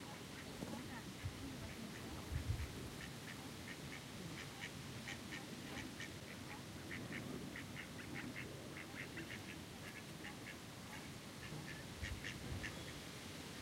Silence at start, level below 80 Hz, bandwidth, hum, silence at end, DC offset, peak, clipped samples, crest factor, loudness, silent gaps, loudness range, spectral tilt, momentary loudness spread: 0 s; -60 dBFS; 16 kHz; none; 0 s; under 0.1%; -30 dBFS; under 0.1%; 20 dB; -49 LUFS; none; 2 LU; -4 dB/octave; 4 LU